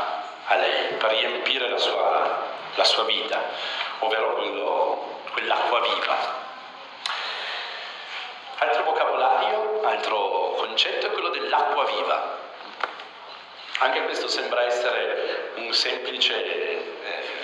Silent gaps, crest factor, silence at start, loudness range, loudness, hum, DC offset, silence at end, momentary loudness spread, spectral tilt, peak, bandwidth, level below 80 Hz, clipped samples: none; 20 dB; 0 s; 4 LU; -24 LUFS; none; under 0.1%; 0 s; 11 LU; -0.5 dB/octave; -6 dBFS; 11.5 kHz; under -90 dBFS; under 0.1%